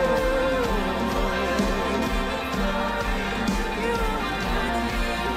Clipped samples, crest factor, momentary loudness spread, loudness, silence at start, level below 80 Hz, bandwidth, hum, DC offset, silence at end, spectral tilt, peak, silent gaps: under 0.1%; 14 dB; 3 LU; -25 LUFS; 0 s; -32 dBFS; 16 kHz; none; under 0.1%; 0 s; -5 dB/octave; -10 dBFS; none